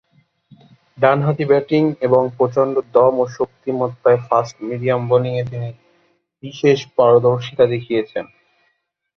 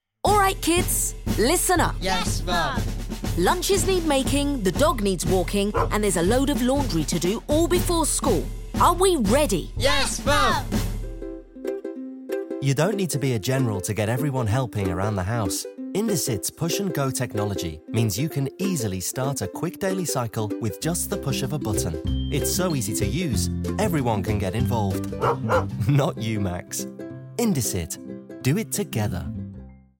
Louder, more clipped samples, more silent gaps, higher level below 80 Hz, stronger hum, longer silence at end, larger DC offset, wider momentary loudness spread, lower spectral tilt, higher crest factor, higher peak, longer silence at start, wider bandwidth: first, -17 LUFS vs -24 LUFS; neither; neither; second, -58 dBFS vs -34 dBFS; neither; first, 0.95 s vs 0.25 s; neither; about the same, 12 LU vs 10 LU; first, -7.5 dB/octave vs -4.5 dB/octave; about the same, 18 dB vs 18 dB; first, 0 dBFS vs -6 dBFS; first, 1 s vs 0.25 s; second, 6.6 kHz vs 17 kHz